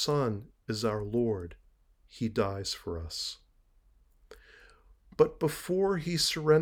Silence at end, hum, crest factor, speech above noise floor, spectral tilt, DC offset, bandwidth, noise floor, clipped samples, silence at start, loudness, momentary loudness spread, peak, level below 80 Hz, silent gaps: 0 s; none; 20 dB; 34 dB; -5 dB/octave; under 0.1%; over 20 kHz; -64 dBFS; under 0.1%; 0 s; -31 LUFS; 11 LU; -10 dBFS; -56 dBFS; none